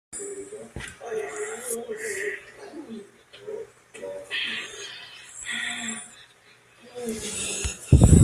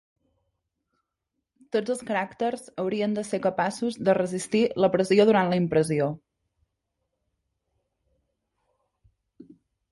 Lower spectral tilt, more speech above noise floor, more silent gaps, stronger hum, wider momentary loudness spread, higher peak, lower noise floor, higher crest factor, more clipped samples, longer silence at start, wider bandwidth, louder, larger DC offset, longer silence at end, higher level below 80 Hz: about the same, -5 dB/octave vs -6 dB/octave; second, 22 dB vs 58 dB; neither; neither; first, 14 LU vs 10 LU; first, -2 dBFS vs -8 dBFS; second, -56 dBFS vs -83 dBFS; about the same, 24 dB vs 20 dB; neither; second, 0.1 s vs 1.75 s; first, 14 kHz vs 11.5 kHz; second, -29 LUFS vs -25 LUFS; neither; second, 0 s vs 0.5 s; first, -36 dBFS vs -66 dBFS